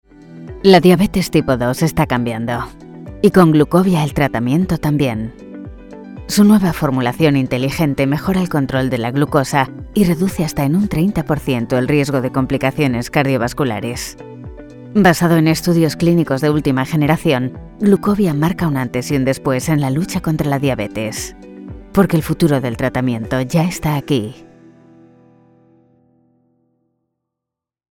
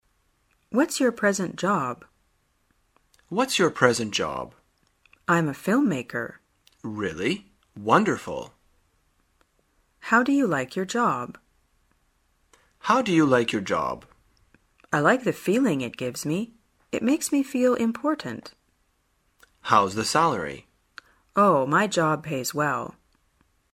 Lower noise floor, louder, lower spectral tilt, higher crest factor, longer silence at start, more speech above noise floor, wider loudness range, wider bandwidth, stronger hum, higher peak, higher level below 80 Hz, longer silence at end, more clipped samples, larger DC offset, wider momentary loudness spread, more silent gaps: first, -84 dBFS vs -69 dBFS; first, -16 LUFS vs -24 LUFS; first, -6.5 dB/octave vs -4.5 dB/octave; second, 16 dB vs 24 dB; second, 0.3 s vs 0.7 s; first, 69 dB vs 45 dB; about the same, 4 LU vs 4 LU; first, 18.5 kHz vs 16 kHz; neither; about the same, 0 dBFS vs -2 dBFS; first, -38 dBFS vs -62 dBFS; first, 3.5 s vs 0.85 s; neither; neither; about the same, 14 LU vs 15 LU; neither